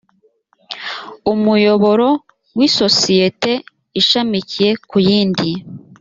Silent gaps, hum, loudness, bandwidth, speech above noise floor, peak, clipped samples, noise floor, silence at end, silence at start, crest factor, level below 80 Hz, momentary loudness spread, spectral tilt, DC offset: none; none; -14 LUFS; 7.8 kHz; 44 dB; 0 dBFS; under 0.1%; -58 dBFS; 0.25 s; 0.7 s; 16 dB; -54 dBFS; 14 LU; -4.5 dB/octave; under 0.1%